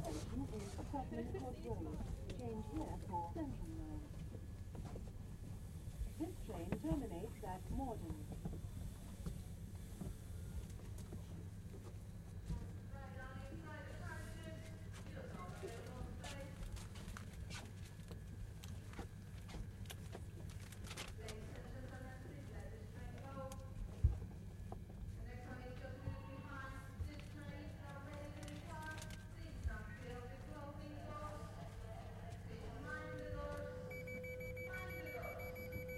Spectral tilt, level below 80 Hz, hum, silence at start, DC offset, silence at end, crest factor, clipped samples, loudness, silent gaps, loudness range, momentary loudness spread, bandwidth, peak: -6 dB/octave; -52 dBFS; none; 0 s; under 0.1%; 0 s; 26 dB; under 0.1%; -50 LUFS; none; 5 LU; 7 LU; 16 kHz; -22 dBFS